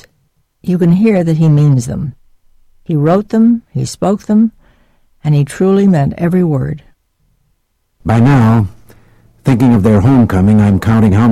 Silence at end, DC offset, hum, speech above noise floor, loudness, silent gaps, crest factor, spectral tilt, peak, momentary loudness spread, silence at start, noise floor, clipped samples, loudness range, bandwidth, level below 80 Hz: 0 s; under 0.1%; none; 51 dB; -11 LUFS; none; 8 dB; -8.5 dB/octave; -2 dBFS; 12 LU; 0.65 s; -61 dBFS; under 0.1%; 4 LU; 13.5 kHz; -36 dBFS